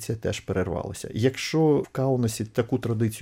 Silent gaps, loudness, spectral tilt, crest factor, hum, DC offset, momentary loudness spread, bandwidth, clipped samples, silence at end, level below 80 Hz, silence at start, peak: none; -26 LUFS; -6 dB/octave; 16 dB; none; under 0.1%; 7 LU; 16.5 kHz; under 0.1%; 0 s; -52 dBFS; 0 s; -10 dBFS